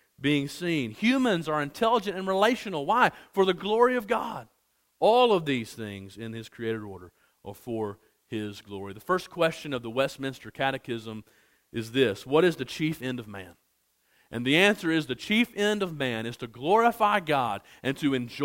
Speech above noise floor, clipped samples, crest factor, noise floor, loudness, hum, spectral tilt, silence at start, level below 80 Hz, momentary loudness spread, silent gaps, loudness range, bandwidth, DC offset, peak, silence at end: 45 dB; under 0.1%; 22 dB; -71 dBFS; -27 LUFS; none; -5 dB/octave; 0.2 s; -64 dBFS; 16 LU; none; 8 LU; 16.5 kHz; under 0.1%; -6 dBFS; 0 s